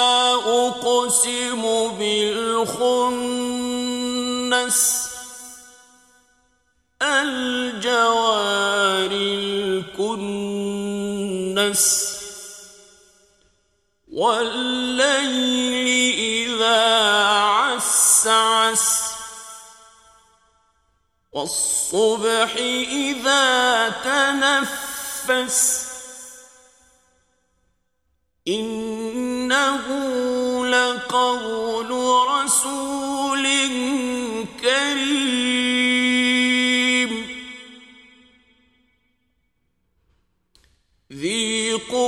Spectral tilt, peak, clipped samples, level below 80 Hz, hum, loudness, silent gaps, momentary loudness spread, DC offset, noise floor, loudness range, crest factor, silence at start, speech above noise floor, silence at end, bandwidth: -1 dB/octave; -2 dBFS; under 0.1%; -60 dBFS; none; -19 LUFS; none; 11 LU; under 0.1%; -71 dBFS; 8 LU; 18 dB; 0 s; 51 dB; 0 s; 16 kHz